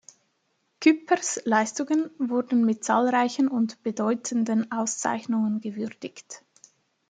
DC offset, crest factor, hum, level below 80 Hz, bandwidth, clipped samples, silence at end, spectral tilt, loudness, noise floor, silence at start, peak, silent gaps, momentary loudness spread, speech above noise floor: under 0.1%; 20 dB; none; -78 dBFS; 9.4 kHz; under 0.1%; 0.7 s; -4 dB/octave; -25 LUFS; -73 dBFS; 0.8 s; -6 dBFS; none; 12 LU; 48 dB